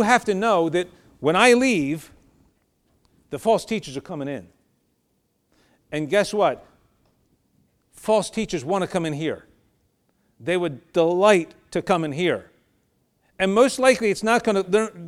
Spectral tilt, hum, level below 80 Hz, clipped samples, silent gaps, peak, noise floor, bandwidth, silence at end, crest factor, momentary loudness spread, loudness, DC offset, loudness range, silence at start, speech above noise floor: -4.5 dB/octave; none; -58 dBFS; under 0.1%; none; -2 dBFS; -70 dBFS; 14.5 kHz; 0 s; 22 dB; 15 LU; -21 LUFS; under 0.1%; 8 LU; 0 s; 49 dB